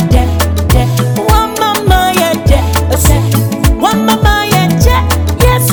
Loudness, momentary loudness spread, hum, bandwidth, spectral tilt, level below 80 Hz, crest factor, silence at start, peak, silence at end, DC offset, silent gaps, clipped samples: -10 LUFS; 3 LU; none; over 20 kHz; -5 dB/octave; -16 dBFS; 8 dB; 0 s; 0 dBFS; 0 s; under 0.1%; none; 0.6%